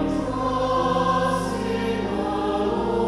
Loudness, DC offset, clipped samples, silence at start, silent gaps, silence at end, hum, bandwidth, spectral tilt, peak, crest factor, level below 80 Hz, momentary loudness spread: -23 LUFS; under 0.1%; under 0.1%; 0 s; none; 0 s; none; 13.5 kHz; -6 dB/octave; -10 dBFS; 12 dB; -40 dBFS; 4 LU